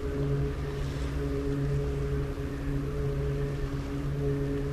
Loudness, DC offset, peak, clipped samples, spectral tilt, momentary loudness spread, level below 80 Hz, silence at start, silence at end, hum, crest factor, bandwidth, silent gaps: -32 LUFS; under 0.1%; -18 dBFS; under 0.1%; -8 dB/octave; 4 LU; -36 dBFS; 0 s; 0 s; none; 12 dB; 13.5 kHz; none